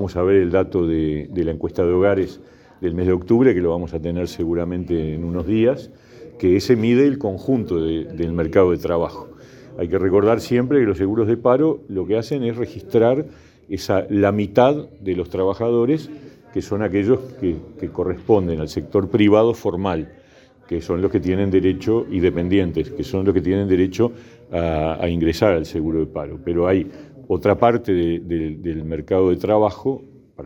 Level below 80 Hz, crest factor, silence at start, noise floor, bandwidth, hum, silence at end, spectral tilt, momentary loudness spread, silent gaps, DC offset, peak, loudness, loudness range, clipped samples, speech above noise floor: -46 dBFS; 18 dB; 0 s; -49 dBFS; 17 kHz; none; 0 s; -8 dB/octave; 10 LU; none; under 0.1%; 0 dBFS; -20 LUFS; 2 LU; under 0.1%; 31 dB